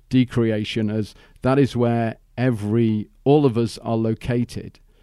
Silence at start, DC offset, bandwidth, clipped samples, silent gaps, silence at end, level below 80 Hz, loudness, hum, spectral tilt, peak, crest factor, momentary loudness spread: 0.1 s; under 0.1%; 12 kHz; under 0.1%; none; 0.35 s; -48 dBFS; -21 LUFS; none; -8 dB/octave; -4 dBFS; 16 dB; 10 LU